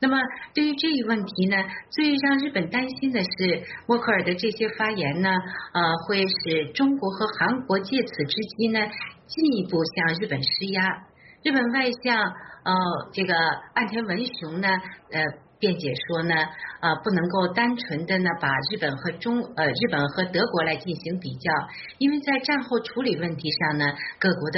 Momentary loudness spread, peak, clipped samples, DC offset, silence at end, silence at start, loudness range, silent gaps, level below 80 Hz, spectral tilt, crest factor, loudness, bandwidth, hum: 5 LU; -8 dBFS; under 0.1%; under 0.1%; 0 s; 0 s; 2 LU; none; -64 dBFS; -3 dB/octave; 16 dB; -24 LUFS; 6 kHz; none